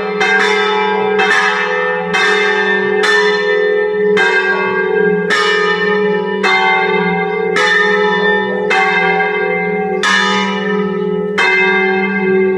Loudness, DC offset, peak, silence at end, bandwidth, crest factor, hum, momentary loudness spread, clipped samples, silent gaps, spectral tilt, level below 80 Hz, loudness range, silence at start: -12 LUFS; under 0.1%; 0 dBFS; 0 s; 11.5 kHz; 12 dB; none; 5 LU; under 0.1%; none; -4 dB/octave; -62 dBFS; 1 LU; 0 s